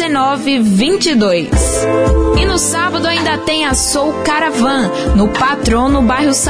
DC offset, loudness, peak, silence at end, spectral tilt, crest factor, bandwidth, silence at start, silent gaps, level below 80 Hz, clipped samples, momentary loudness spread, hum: 0.6%; -12 LUFS; -2 dBFS; 0 s; -4 dB/octave; 10 dB; 11 kHz; 0 s; none; -22 dBFS; under 0.1%; 2 LU; none